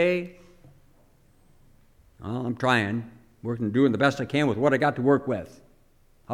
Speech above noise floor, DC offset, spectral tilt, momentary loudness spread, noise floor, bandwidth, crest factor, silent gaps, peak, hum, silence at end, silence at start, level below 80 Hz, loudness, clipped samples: 35 dB; under 0.1%; -6.5 dB/octave; 17 LU; -59 dBFS; 13 kHz; 20 dB; none; -6 dBFS; none; 0 s; 0 s; -58 dBFS; -25 LUFS; under 0.1%